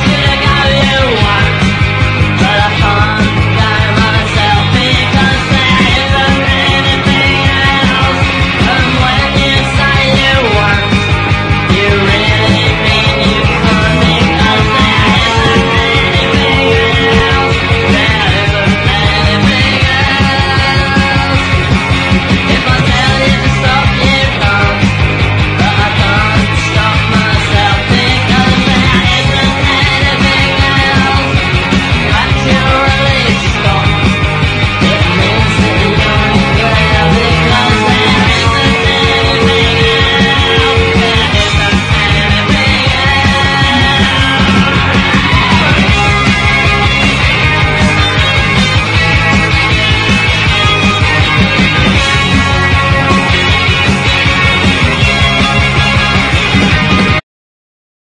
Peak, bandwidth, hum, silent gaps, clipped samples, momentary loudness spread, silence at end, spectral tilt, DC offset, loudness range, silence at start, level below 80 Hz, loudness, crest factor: 0 dBFS; 11 kHz; none; none; 0.4%; 2 LU; 0.9 s; -5 dB/octave; under 0.1%; 1 LU; 0 s; -20 dBFS; -8 LUFS; 8 dB